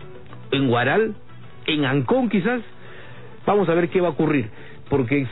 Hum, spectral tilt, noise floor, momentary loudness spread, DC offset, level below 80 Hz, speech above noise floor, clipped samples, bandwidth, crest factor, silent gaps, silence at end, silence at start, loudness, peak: none; -11 dB/octave; -42 dBFS; 22 LU; 1%; -54 dBFS; 22 dB; under 0.1%; 4.1 kHz; 14 dB; none; 0 s; 0 s; -21 LUFS; -8 dBFS